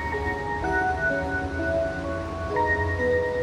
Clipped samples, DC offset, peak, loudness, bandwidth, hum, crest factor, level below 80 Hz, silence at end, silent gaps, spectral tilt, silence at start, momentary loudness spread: under 0.1%; under 0.1%; -12 dBFS; -26 LUFS; 11 kHz; none; 14 dB; -38 dBFS; 0 s; none; -6.5 dB/octave; 0 s; 5 LU